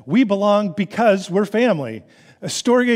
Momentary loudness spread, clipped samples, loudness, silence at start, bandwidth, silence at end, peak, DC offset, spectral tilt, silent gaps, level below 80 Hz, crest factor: 12 LU; under 0.1%; -18 LUFS; 0.05 s; 15 kHz; 0 s; -4 dBFS; under 0.1%; -5 dB/octave; none; -68 dBFS; 14 dB